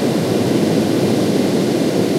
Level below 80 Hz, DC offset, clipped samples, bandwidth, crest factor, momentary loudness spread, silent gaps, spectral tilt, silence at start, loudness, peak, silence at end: -54 dBFS; under 0.1%; under 0.1%; 16 kHz; 12 dB; 1 LU; none; -6 dB/octave; 0 s; -16 LUFS; -4 dBFS; 0 s